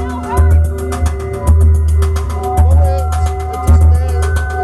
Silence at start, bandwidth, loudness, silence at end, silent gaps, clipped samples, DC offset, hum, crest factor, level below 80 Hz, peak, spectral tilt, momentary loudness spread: 0 s; 12.5 kHz; -13 LUFS; 0 s; none; under 0.1%; under 0.1%; none; 10 dB; -14 dBFS; -2 dBFS; -7 dB/octave; 7 LU